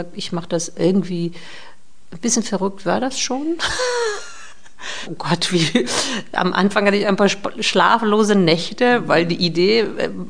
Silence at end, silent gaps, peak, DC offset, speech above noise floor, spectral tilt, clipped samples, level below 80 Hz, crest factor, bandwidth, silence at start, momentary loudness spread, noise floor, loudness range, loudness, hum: 0 s; none; 0 dBFS; 3%; 24 dB; -4 dB/octave; under 0.1%; -52 dBFS; 18 dB; 10 kHz; 0 s; 12 LU; -42 dBFS; 6 LU; -18 LUFS; none